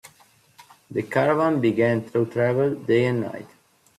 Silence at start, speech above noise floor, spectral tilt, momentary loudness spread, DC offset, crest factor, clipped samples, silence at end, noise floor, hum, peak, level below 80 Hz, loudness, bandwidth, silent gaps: 0.05 s; 35 dB; -7.5 dB/octave; 11 LU; under 0.1%; 16 dB; under 0.1%; 0.5 s; -57 dBFS; none; -8 dBFS; -64 dBFS; -22 LUFS; 13.5 kHz; none